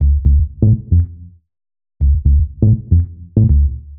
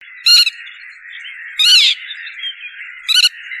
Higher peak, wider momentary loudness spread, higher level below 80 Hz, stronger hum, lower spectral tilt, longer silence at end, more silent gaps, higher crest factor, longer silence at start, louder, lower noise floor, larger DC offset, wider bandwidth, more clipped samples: about the same, -2 dBFS vs 0 dBFS; second, 4 LU vs 23 LU; first, -16 dBFS vs -68 dBFS; neither; first, -17.5 dB/octave vs 7.5 dB/octave; about the same, 0 s vs 0 s; neither; about the same, 12 dB vs 16 dB; second, 0 s vs 0.25 s; second, -15 LUFS vs -10 LUFS; about the same, -36 dBFS vs -35 dBFS; neither; second, 0.8 kHz vs 16 kHz; neither